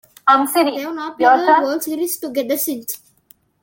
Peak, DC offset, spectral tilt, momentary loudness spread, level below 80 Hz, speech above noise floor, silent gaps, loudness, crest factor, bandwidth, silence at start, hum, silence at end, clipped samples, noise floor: -2 dBFS; under 0.1%; -2 dB/octave; 13 LU; -68 dBFS; 37 dB; none; -17 LUFS; 16 dB; 17 kHz; 0.25 s; none; 0.65 s; under 0.1%; -54 dBFS